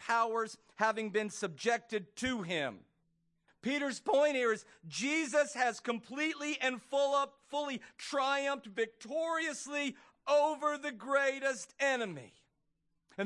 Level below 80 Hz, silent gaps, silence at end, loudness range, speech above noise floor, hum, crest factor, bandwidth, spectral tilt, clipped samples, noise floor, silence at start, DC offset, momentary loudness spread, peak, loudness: -76 dBFS; none; 0 s; 3 LU; 45 dB; none; 20 dB; 11.5 kHz; -3 dB/octave; under 0.1%; -79 dBFS; 0 s; under 0.1%; 9 LU; -16 dBFS; -34 LUFS